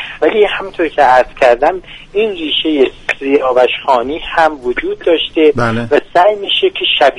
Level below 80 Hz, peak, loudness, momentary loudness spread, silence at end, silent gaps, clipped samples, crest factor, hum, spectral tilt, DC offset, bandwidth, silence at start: -38 dBFS; 0 dBFS; -12 LUFS; 7 LU; 0 s; none; under 0.1%; 12 dB; none; -5 dB/octave; under 0.1%; 11 kHz; 0 s